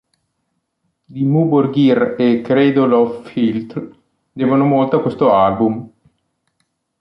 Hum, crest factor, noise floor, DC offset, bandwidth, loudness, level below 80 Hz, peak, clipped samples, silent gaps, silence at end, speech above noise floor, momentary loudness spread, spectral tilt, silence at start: none; 14 dB; -71 dBFS; under 0.1%; 5.6 kHz; -15 LUFS; -54 dBFS; -2 dBFS; under 0.1%; none; 1.15 s; 57 dB; 12 LU; -9.5 dB/octave; 1.1 s